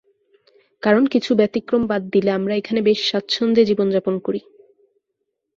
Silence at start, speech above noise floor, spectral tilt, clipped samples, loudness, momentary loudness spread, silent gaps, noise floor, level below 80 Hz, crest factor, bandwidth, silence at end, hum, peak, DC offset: 0.85 s; 58 dB; -6 dB/octave; under 0.1%; -19 LUFS; 7 LU; none; -76 dBFS; -60 dBFS; 18 dB; 7.6 kHz; 1.2 s; none; -2 dBFS; under 0.1%